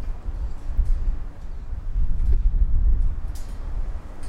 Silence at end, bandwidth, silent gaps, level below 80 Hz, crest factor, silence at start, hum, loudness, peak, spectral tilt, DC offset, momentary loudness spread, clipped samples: 0 s; 2.5 kHz; none; -22 dBFS; 12 dB; 0 s; none; -29 LUFS; -8 dBFS; -7.5 dB/octave; under 0.1%; 12 LU; under 0.1%